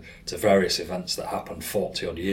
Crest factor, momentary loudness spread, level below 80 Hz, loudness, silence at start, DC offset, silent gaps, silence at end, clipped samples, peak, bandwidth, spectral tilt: 20 dB; 11 LU; -50 dBFS; -26 LUFS; 0 s; under 0.1%; none; 0 s; under 0.1%; -6 dBFS; 16.5 kHz; -4 dB/octave